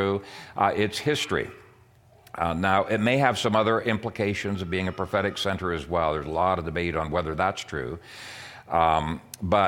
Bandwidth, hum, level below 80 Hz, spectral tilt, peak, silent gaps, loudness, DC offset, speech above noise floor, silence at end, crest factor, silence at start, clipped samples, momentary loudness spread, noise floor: 17 kHz; none; -48 dBFS; -5.5 dB/octave; -6 dBFS; none; -26 LUFS; under 0.1%; 30 dB; 0 s; 20 dB; 0 s; under 0.1%; 12 LU; -56 dBFS